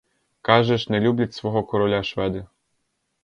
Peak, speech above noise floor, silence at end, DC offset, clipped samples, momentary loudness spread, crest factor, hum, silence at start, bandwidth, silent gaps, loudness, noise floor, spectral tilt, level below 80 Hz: -2 dBFS; 52 dB; 0.8 s; under 0.1%; under 0.1%; 9 LU; 20 dB; none; 0.45 s; 7.2 kHz; none; -22 LUFS; -73 dBFS; -7 dB/octave; -50 dBFS